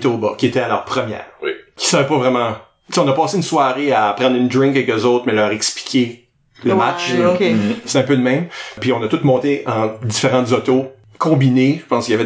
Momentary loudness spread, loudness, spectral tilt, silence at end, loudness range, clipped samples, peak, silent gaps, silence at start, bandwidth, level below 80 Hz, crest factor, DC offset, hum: 7 LU; -16 LUFS; -5 dB/octave; 0 s; 2 LU; under 0.1%; -2 dBFS; none; 0 s; 8 kHz; -58 dBFS; 14 dB; under 0.1%; none